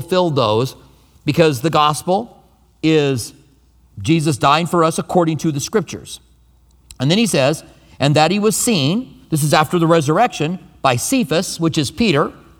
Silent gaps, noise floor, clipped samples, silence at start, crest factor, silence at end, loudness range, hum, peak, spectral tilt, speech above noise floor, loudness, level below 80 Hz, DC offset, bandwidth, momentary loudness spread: none; -52 dBFS; under 0.1%; 0 s; 16 dB; 0.25 s; 3 LU; none; 0 dBFS; -5 dB/octave; 36 dB; -16 LUFS; -50 dBFS; under 0.1%; 18.5 kHz; 10 LU